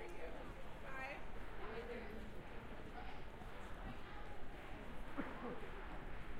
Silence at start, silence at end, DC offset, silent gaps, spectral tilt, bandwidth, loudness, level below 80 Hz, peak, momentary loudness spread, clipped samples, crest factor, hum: 0 s; 0 s; under 0.1%; none; -6 dB/octave; 14 kHz; -52 LUFS; -54 dBFS; -30 dBFS; 5 LU; under 0.1%; 16 dB; none